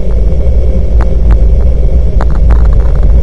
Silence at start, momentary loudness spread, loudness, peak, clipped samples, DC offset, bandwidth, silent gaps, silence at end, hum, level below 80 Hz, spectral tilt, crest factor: 0 s; 3 LU; -10 LUFS; 0 dBFS; 4%; under 0.1%; 3.4 kHz; none; 0 s; none; -6 dBFS; -9.5 dB/octave; 6 dB